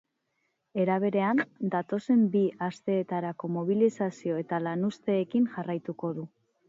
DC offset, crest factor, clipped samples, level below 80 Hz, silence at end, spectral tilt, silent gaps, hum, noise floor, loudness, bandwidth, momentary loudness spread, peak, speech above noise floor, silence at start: under 0.1%; 16 dB; under 0.1%; -78 dBFS; 0.4 s; -8 dB/octave; none; none; -78 dBFS; -29 LUFS; 7.8 kHz; 9 LU; -12 dBFS; 50 dB; 0.75 s